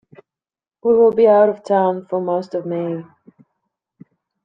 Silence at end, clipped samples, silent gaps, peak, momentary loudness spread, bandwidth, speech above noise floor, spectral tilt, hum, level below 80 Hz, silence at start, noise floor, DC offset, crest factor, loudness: 1.4 s; under 0.1%; none; -2 dBFS; 12 LU; 7.2 kHz; over 74 dB; -8.5 dB/octave; none; -64 dBFS; 0.85 s; under -90 dBFS; under 0.1%; 16 dB; -17 LUFS